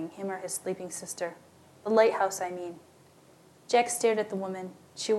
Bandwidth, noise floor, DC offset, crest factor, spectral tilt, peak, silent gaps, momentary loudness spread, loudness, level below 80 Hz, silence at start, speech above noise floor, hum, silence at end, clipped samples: 14 kHz; -58 dBFS; under 0.1%; 22 dB; -3 dB/octave; -10 dBFS; none; 16 LU; -30 LUFS; -82 dBFS; 0 s; 28 dB; none; 0 s; under 0.1%